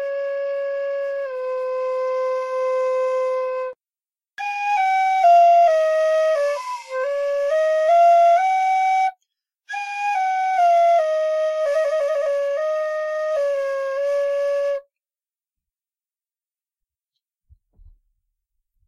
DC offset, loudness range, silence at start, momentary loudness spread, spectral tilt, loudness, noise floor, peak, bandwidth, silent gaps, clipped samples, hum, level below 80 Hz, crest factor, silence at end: under 0.1%; 7 LU; 0 s; 12 LU; 0.5 dB/octave; -20 LUFS; under -90 dBFS; -8 dBFS; 11.5 kHz; none; under 0.1%; none; -66 dBFS; 14 dB; 4.05 s